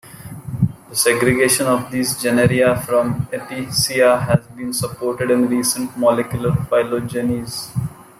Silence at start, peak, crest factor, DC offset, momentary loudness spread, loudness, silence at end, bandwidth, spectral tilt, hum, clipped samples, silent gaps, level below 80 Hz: 0.05 s; 0 dBFS; 18 dB; under 0.1%; 10 LU; -18 LUFS; 0.15 s; 15.5 kHz; -4.5 dB/octave; none; under 0.1%; none; -46 dBFS